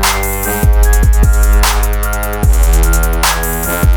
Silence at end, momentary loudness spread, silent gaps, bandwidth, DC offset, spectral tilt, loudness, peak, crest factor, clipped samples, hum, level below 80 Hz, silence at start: 0 s; 4 LU; none; over 20 kHz; under 0.1%; -4 dB/octave; -12 LUFS; 0 dBFS; 10 dB; under 0.1%; none; -10 dBFS; 0 s